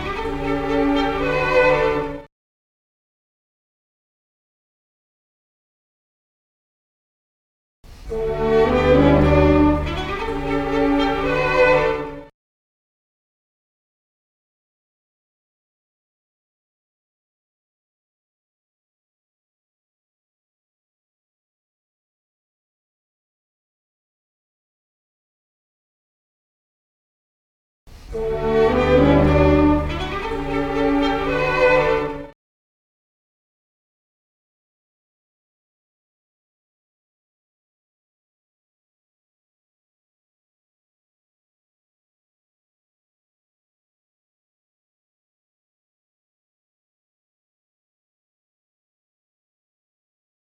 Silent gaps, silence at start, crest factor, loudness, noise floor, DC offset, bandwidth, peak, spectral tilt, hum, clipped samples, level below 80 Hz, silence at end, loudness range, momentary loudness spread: 2.32-7.83 s, 12.34-27.86 s; 0 s; 22 dB; -18 LUFS; under -90 dBFS; under 0.1%; 9.8 kHz; -2 dBFS; -7.5 dB/octave; none; under 0.1%; -36 dBFS; 18.3 s; 11 LU; 11 LU